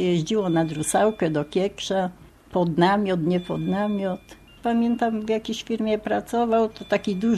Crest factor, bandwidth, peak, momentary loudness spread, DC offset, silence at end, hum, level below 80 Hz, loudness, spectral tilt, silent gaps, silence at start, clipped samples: 16 dB; 13.5 kHz; -6 dBFS; 6 LU; under 0.1%; 0 s; none; -54 dBFS; -24 LUFS; -5.5 dB/octave; none; 0 s; under 0.1%